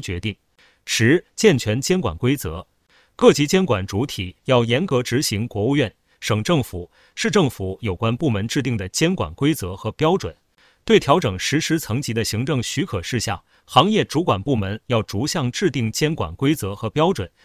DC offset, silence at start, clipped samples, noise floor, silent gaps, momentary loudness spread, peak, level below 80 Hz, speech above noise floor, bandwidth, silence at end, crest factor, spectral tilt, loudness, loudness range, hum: under 0.1%; 0 s; under 0.1%; -59 dBFS; none; 10 LU; 0 dBFS; -42 dBFS; 39 dB; 16 kHz; 0.2 s; 20 dB; -5 dB/octave; -20 LUFS; 3 LU; none